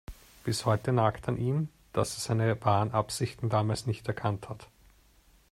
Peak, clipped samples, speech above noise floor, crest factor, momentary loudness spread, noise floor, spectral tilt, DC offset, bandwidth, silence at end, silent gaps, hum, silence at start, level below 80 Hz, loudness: -10 dBFS; under 0.1%; 33 dB; 20 dB; 9 LU; -62 dBFS; -6 dB/octave; under 0.1%; 13.5 kHz; 0.85 s; none; none; 0.1 s; -56 dBFS; -30 LUFS